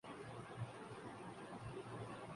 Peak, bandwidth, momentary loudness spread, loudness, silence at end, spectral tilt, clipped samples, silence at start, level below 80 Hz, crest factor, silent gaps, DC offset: -34 dBFS; 11.5 kHz; 2 LU; -52 LUFS; 0 s; -6 dB/octave; under 0.1%; 0.05 s; -72 dBFS; 16 dB; none; under 0.1%